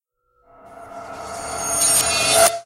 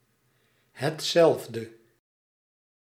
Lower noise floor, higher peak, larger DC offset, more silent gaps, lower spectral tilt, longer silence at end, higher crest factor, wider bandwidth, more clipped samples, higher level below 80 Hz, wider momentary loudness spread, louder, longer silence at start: second, -61 dBFS vs -69 dBFS; first, -2 dBFS vs -8 dBFS; neither; neither; second, 0 dB/octave vs -4.5 dB/octave; second, 0 s vs 1.25 s; about the same, 18 dB vs 20 dB; about the same, 16 kHz vs 16 kHz; neither; first, -50 dBFS vs -80 dBFS; first, 22 LU vs 17 LU; first, -16 LUFS vs -25 LUFS; about the same, 0.65 s vs 0.75 s